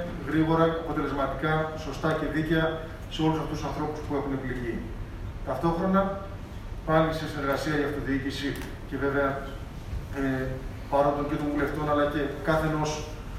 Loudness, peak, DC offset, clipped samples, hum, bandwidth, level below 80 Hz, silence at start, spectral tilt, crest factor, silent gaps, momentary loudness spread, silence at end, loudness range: -28 LUFS; -8 dBFS; under 0.1%; under 0.1%; none; 15.5 kHz; -40 dBFS; 0 s; -6.5 dB/octave; 20 dB; none; 12 LU; 0 s; 3 LU